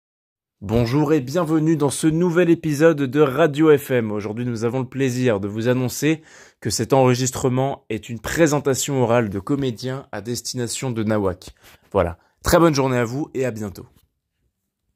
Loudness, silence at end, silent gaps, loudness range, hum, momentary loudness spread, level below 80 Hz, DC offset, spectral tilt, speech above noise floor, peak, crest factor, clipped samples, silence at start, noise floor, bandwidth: -20 LUFS; 1.1 s; none; 4 LU; none; 11 LU; -46 dBFS; under 0.1%; -5.5 dB/octave; 53 dB; -2 dBFS; 18 dB; under 0.1%; 0.6 s; -72 dBFS; 16 kHz